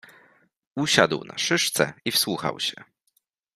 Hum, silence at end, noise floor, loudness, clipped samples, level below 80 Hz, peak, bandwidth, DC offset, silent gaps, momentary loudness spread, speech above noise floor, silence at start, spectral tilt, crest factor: none; 0.75 s; -71 dBFS; -23 LUFS; under 0.1%; -66 dBFS; -2 dBFS; 15.5 kHz; under 0.1%; none; 9 LU; 47 dB; 0.75 s; -2.5 dB/octave; 24 dB